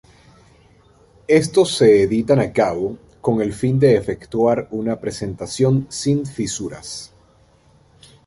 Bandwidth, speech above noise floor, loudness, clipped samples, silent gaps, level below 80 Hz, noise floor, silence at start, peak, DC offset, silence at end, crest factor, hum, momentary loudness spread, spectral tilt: 11.5 kHz; 36 dB; -18 LUFS; under 0.1%; none; -48 dBFS; -53 dBFS; 1.3 s; -2 dBFS; under 0.1%; 1.2 s; 18 dB; none; 13 LU; -6 dB/octave